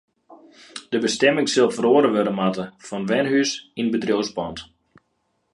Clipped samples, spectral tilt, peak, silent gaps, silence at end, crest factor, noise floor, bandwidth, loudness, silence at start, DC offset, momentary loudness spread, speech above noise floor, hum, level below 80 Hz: under 0.1%; -4.5 dB/octave; -4 dBFS; none; 0.9 s; 20 dB; -71 dBFS; 11.5 kHz; -21 LUFS; 0.3 s; under 0.1%; 14 LU; 50 dB; none; -60 dBFS